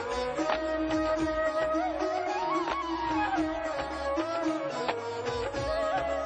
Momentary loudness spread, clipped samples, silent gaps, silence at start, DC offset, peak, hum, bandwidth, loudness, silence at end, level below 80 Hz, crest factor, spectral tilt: 4 LU; under 0.1%; none; 0 s; under 0.1%; -14 dBFS; none; 9.4 kHz; -30 LUFS; 0 s; -50 dBFS; 16 dB; -5 dB/octave